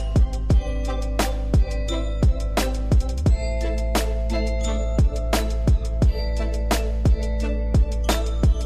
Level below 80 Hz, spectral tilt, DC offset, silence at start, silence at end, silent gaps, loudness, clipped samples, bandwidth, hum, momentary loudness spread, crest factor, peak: -22 dBFS; -6 dB/octave; 0.6%; 0 s; 0 s; none; -23 LUFS; under 0.1%; 15 kHz; none; 4 LU; 14 dB; -6 dBFS